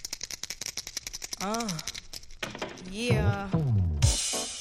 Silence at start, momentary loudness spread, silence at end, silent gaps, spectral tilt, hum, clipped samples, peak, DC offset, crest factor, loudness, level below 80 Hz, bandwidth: 0 s; 12 LU; 0 s; none; -4 dB/octave; none; under 0.1%; -12 dBFS; under 0.1%; 20 dB; -30 LUFS; -40 dBFS; 15.5 kHz